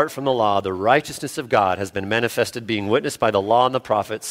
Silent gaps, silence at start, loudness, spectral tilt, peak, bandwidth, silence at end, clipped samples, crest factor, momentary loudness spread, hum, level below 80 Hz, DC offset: none; 0 s; -20 LUFS; -4.5 dB/octave; -2 dBFS; 16 kHz; 0 s; under 0.1%; 18 dB; 6 LU; none; -56 dBFS; under 0.1%